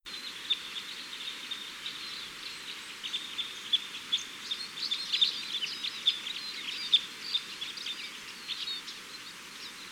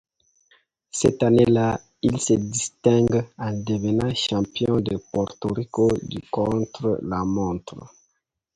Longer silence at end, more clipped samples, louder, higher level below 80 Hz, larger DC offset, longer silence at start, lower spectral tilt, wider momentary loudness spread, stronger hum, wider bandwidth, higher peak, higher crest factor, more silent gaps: second, 0 s vs 0.7 s; neither; second, -33 LUFS vs -23 LUFS; second, -76 dBFS vs -48 dBFS; neither; second, 0.05 s vs 0.95 s; second, 1 dB/octave vs -5.5 dB/octave; first, 14 LU vs 10 LU; neither; first, over 20 kHz vs 11 kHz; second, -14 dBFS vs -4 dBFS; about the same, 22 dB vs 18 dB; neither